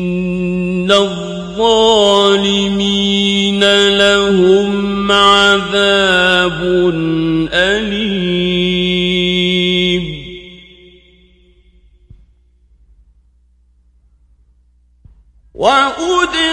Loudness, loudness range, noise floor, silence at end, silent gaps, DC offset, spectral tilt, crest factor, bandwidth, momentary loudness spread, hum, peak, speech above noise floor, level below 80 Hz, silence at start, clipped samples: -12 LUFS; 9 LU; -52 dBFS; 0 s; none; under 0.1%; -4.5 dB/octave; 14 dB; 11.5 kHz; 8 LU; none; 0 dBFS; 41 dB; -40 dBFS; 0 s; under 0.1%